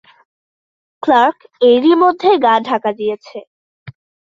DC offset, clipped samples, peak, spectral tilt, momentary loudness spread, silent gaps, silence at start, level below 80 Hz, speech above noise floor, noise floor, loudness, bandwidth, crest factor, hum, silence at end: under 0.1%; under 0.1%; -2 dBFS; -6 dB/octave; 14 LU; 3.47-3.86 s; 1.05 s; -62 dBFS; over 77 dB; under -90 dBFS; -13 LUFS; 7.4 kHz; 14 dB; none; 0.45 s